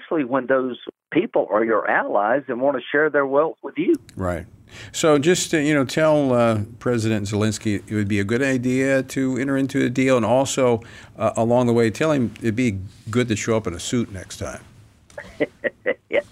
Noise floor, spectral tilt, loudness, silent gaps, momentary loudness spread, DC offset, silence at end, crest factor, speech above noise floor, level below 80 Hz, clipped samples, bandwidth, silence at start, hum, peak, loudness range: -43 dBFS; -5.5 dB/octave; -21 LUFS; none; 10 LU; under 0.1%; 0.1 s; 14 dB; 22 dB; -52 dBFS; under 0.1%; 15.5 kHz; 0 s; none; -6 dBFS; 4 LU